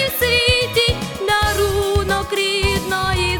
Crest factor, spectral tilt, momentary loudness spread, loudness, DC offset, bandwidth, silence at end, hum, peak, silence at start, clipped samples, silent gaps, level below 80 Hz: 14 dB; -3.5 dB/octave; 5 LU; -17 LUFS; under 0.1%; 19.5 kHz; 0 s; none; -2 dBFS; 0 s; under 0.1%; none; -30 dBFS